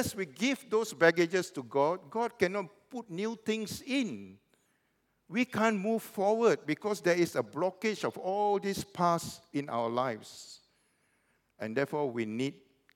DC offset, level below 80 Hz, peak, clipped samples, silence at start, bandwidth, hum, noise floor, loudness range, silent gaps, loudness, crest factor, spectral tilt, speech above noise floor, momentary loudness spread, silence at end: under 0.1%; -74 dBFS; -10 dBFS; under 0.1%; 0 s; 17.5 kHz; none; -76 dBFS; 5 LU; none; -32 LUFS; 22 dB; -5 dB/octave; 44 dB; 11 LU; 0.45 s